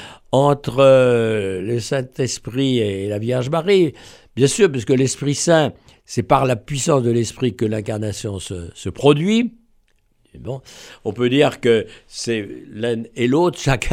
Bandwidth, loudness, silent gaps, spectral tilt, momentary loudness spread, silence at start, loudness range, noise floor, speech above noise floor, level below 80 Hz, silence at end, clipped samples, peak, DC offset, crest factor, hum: 16 kHz; -18 LUFS; none; -5.5 dB/octave; 14 LU; 0 s; 4 LU; -60 dBFS; 42 dB; -46 dBFS; 0 s; under 0.1%; 0 dBFS; under 0.1%; 18 dB; none